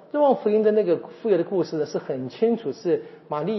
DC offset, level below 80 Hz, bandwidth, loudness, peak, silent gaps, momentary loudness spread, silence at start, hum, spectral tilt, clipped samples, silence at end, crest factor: under 0.1%; -80 dBFS; 6 kHz; -23 LUFS; -8 dBFS; none; 9 LU; 0.15 s; none; -6.5 dB/octave; under 0.1%; 0 s; 16 dB